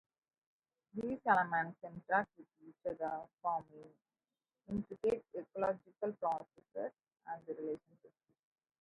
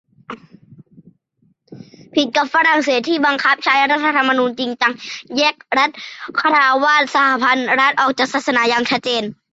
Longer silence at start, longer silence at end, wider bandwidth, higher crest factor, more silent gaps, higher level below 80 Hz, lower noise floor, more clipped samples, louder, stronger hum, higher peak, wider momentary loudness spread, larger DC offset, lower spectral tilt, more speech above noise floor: first, 0.95 s vs 0.3 s; first, 0.75 s vs 0.2 s; first, 10.5 kHz vs 8 kHz; first, 24 dB vs 14 dB; neither; second, -74 dBFS vs -66 dBFS; first, under -90 dBFS vs -61 dBFS; neither; second, -40 LUFS vs -15 LUFS; neither; second, -18 dBFS vs -2 dBFS; first, 16 LU vs 9 LU; neither; first, -7.5 dB/octave vs -2.5 dB/octave; first, over 50 dB vs 45 dB